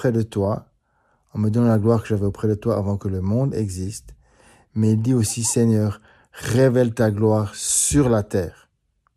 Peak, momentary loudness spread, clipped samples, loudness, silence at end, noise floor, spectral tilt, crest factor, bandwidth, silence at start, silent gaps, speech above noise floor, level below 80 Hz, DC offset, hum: -4 dBFS; 13 LU; under 0.1%; -20 LUFS; 0.65 s; -68 dBFS; -6 dB/octave; 16 dB; 14.5 kHz; 0 s; none; 48 dB; -46 dBFS; under 0.1%; none